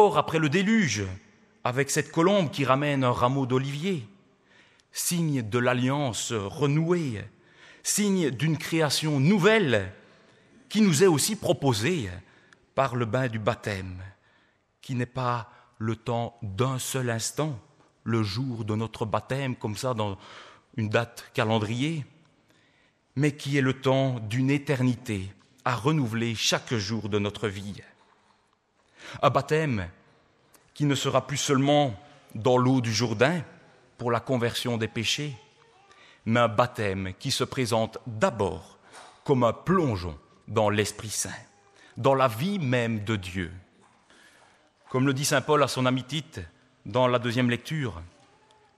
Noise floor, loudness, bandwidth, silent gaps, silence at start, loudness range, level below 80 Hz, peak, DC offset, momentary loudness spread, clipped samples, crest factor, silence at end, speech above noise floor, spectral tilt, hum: -68 dBFS; -26 LUFS; 14.5 kHz; none; 0 s; 5 LU; -60 dBFS; -6 dBFS; under 0.1%; 15 LU; under 0.1%; 22 dB; 0.7 s; 42 dB; -5 dB/octave; none